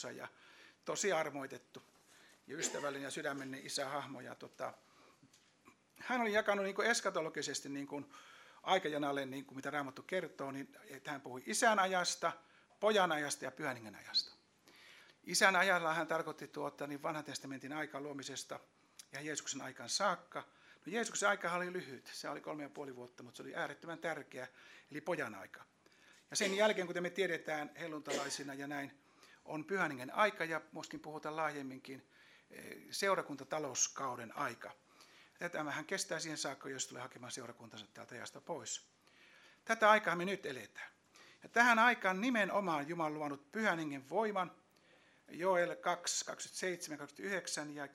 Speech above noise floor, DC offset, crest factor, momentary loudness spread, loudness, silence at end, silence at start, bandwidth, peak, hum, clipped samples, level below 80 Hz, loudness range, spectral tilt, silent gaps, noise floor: 30 dB; under 0.1%; 26 dB; 18 LU; -38 LUFS; 0.05 s; 0 s; 16 kHz; -14 dBFS; none; under 0.1%; -90 dBFS; 9 LU; -2.5 dB/octave; none; -69 dBFS